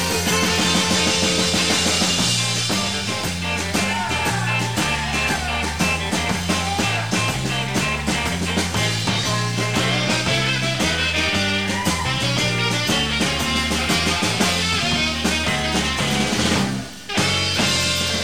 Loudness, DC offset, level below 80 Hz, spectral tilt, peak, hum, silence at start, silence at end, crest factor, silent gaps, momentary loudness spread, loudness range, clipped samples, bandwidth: -19 LUFS; 0.7%; -38 dBFS; -3 dB/octave; -4 dBFS; none; 0 s; 0 s; 16 dB; none; 4 LU; 2 LU; under 0.1%; 16.5 kHz